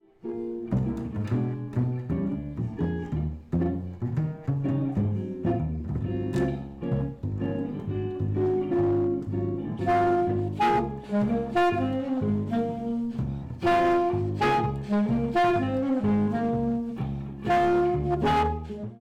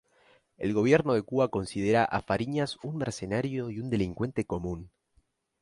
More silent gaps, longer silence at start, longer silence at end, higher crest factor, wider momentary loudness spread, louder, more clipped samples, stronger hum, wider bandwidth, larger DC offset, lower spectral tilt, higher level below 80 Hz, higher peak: neither; second, 0.25 s vs 0.6 s; second, 0.05 s vs 0.75 s; second, 8 dB vs 20 dB; about the same, 8 LU vs 10 LU; about the same, -27 LUFS vs -29 LUFS; neither; neither; second, 10 kHz vs 11.5 kHz; neither; first, -8.5 dB/octave vs -6.5 dB/octave; first, -46 dBFS vs -54 dBFS; second, -18 dBFS vs -8 dBFS